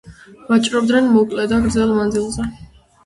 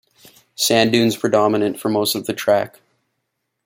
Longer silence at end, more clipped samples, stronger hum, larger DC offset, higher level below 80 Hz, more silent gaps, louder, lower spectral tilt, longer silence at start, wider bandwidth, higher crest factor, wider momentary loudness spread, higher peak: second, 0.4 s vs 1 s; neither; neither; neither; first, -38 dBFS vs -62 dBFS; neither; about the same, -16 LUFS vs -18 LUFS; about the same, -5 dB/octave vs -4 dB/octave; second, 0.05 s vs 0.6 s; second, 11.5 kHz vs 16.5 kHz; about the same, 14 dB vs 18 dB; first, 10 LU vs 6 LU; about the same, -4 dBFS vs -2 dBFS